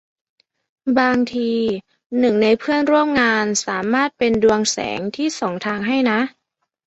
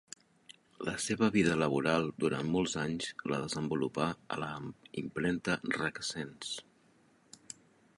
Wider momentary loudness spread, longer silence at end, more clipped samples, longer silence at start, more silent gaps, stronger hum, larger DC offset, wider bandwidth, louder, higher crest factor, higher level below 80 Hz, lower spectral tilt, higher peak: second, 8 LU vs 14 LU; second, 0.6 s vs 1.35 s; neither; about the same, 0.85 s vs 0.8 s; first, 2.06-2.10 s vs none; neither; neither; second, 8.2 kHz vs 11.5 kHz; first, -18 LUFS vs -34 LUFS; second, 16 dB vs 22 dB; first, -54 dBFS vs -64 dBFS; about the same, -4 dB/octave vs -4.5 dB/octave; first, -2 dBFS vs -14 dBFS